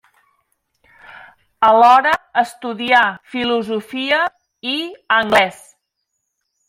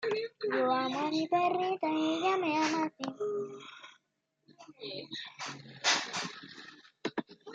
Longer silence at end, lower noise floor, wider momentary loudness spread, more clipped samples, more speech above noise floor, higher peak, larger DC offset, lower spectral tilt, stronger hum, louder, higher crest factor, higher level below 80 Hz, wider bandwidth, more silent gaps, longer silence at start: first, 1.15 s vs 0 s; second, -74 dBFS vs -80 dBFS; second, 12 LU vs 17 LU; neither; first, 58 dB vs 48 dB; first, 0 dBFS vs -14 dBFS; neither; about the same, -3.5 dB/octave vs -3 dB/octave; neither; first, -16 LUFS vs -33 LUFS; about the same, 18 dB vs 20 dB; first, -60 dBFS vs -84 dBFS; first, 16 kHz vs 9.4 kHz; neither; first, 1.6 s vs 0 s